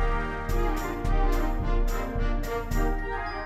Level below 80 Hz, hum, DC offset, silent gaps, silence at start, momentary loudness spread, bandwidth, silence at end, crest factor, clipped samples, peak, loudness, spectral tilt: -26 dBFS; none; under 0.1%; none; 0 s; 3 LU; 14 kHz; 0 s; 12 dB; under 0.1%; -14 dBFS; -30 LUFS; -6 dB/octave